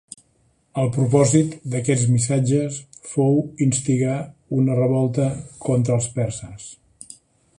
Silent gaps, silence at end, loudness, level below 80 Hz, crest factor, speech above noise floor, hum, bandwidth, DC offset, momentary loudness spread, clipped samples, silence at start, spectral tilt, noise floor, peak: none; 0.45 s; -21 LUFS; -54 dBFS; 16 dB; 43 dB; none; 11 kHz; under 0.1%; 16 LU; under 0.1%; 0.75 s; -6.5 dB/octave; -62 dBFS; -4 dBFS